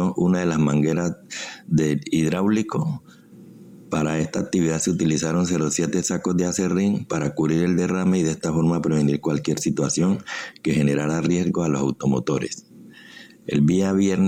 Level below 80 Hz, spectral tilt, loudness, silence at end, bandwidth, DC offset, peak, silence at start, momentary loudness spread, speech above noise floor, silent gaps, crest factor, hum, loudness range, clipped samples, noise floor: -52 dBFS; -6 dB/octave; -22 LUFS; 0 s; 16 kHz; under 0.1%; -10 dBFS; 0 s; 7 LU; 24 dB; none; 12 dB; none; 2 LU; under 0.1%; -45 dBFS